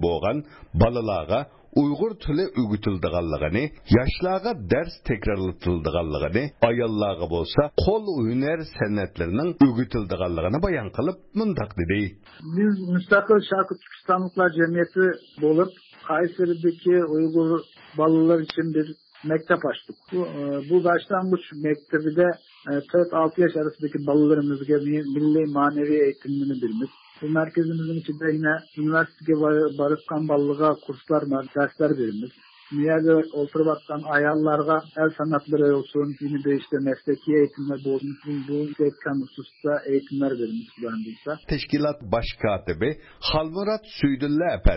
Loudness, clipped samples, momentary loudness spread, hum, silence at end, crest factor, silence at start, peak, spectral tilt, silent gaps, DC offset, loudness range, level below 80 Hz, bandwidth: -24 LUFS; under 0.1%; 8 LU; none; 0 s; 16 dB; 0 s; -6 dBFS; -11.5 dB/octave; none; under 0.1%; 4 LU; -40 dBFS; 5.8 kHz